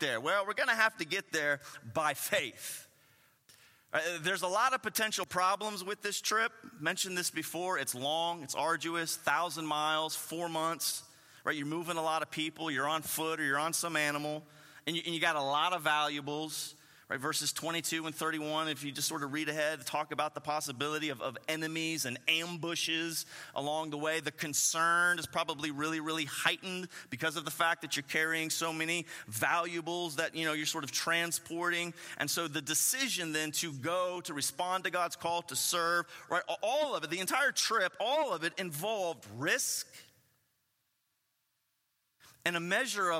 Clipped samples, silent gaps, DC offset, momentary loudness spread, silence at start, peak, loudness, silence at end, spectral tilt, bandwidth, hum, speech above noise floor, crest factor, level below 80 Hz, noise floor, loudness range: under 0.1%; none; under 0.1%; 7 LU; 0 s; -12 dBFS; -33 LUFS; 0 s; -2 dB/octave; 16.5 kHz; none; 46 dB; 22 dB; -82 dBFS; -80 dBFS; 3 LU